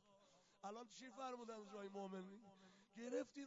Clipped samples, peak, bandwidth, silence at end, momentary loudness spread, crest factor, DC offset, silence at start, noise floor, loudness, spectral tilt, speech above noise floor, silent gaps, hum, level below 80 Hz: under 0.1%; -36 dBFS; 7.4 kHz; 0 s; 16 LU; 20 dB; under 0.1%; 0.05 s; -74 dBFS; -54 LUFS; -4.5 dB/octave; 21 dB; none; none; under -90 dBFS